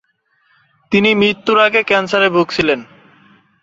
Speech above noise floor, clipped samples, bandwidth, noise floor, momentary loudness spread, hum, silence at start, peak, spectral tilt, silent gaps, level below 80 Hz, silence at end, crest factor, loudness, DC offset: 47 dB; under 0.1%; 7.8 kHz; -60 dBFS; 6 LU; none; 0.9 s; -2 dBFS; -5 dB/octave; none; -54 dBFS; 0.8 s; 14 dB; -13 LUFS; under 0.1%